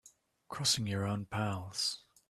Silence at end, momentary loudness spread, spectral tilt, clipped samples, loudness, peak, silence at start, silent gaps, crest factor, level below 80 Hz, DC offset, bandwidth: 0.3 s; 6 LU; -3.5 dB/octave; under 0.1%; -34 LUFS; -18 dBFS; 0.05 s; none; 20 dB; -68 dBFS; under 0.1%; 14 kHz